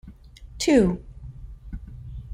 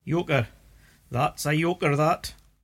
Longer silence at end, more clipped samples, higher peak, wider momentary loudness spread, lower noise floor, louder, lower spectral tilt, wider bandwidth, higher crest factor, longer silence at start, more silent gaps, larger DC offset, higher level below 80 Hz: second, 0 s vs 0.3 s; neither; about the same, -6 dBFS vs -8 dBFS; first, 24 LU vs 11 LU; second, -45 dBFS vs -55 dBFS; first, -22 LUFS vs -25 LUFS; about the same, -5.5 dB/octave vs -5.5 dB/octave; about the same, 16 kHz vs 16.5 kHz; about the same, 20 dB vs 18 dB; about the same, 0.05 s vs 0.05 s; neither; neither; first, -40 dBFS vs -52 dBFS